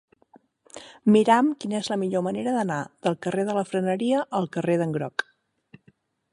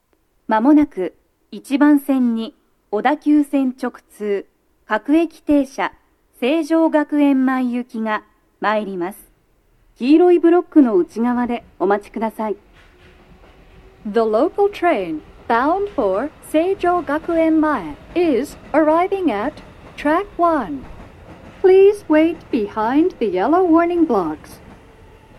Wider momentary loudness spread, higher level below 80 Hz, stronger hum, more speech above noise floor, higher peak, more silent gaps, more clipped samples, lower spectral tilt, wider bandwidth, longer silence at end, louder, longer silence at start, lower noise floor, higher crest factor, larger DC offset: second, 9 LU vs 12 LU; second, -72 dBFS vs -50 dBFS; neither; about the same, 38 dB vs 41 dB; about the same, -4 dBFS vs -2 dBFS; neither; neither; about the same, -6 dB/octave vs -6.5 dB/octave; about the same, 11.5 kHz vs 12.5 kHz; first, 1.1 s vs 0.85 s; second, -24 LUFS vs -18 LUFS; first, 0.75 s vs 0.5 s; first, -62 dBFS vs -57 dBFS; about the same, 20 dB vs 16 dB; neither